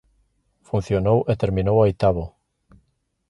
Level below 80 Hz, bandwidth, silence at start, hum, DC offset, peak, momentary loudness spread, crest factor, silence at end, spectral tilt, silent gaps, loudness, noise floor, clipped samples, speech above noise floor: -40 dBFS; 11 kHz; 0.75 s; none; under 0.1%; -4 dBFS; 10 LU; 18 dB; 1 s; -9 dB/octave; none; -21 LUFS; -69 dBFS; under 0.1%; 49 dB